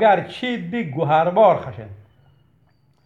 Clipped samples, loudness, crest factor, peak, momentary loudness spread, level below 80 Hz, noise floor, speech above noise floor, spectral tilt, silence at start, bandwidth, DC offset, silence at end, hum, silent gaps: under 0.1%; -19 LUFS; 18 dB; -2 dBFS; 20 LU; -62 dBFS; -59 dBFS; 41 dB; -7.5 dB/octave; 0 s; 7.6 kHz; under 0.1%; 1.1 s; none; none